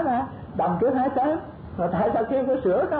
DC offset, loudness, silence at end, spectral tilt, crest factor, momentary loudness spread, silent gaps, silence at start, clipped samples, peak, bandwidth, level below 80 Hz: under 0.1%; -24 LUFS; 0 s; -12 dB/octave; 10 dB; 8 LU; none; 0 s; under 0.1%; -14 dBFS; 4.7 kHz; -50 dBFS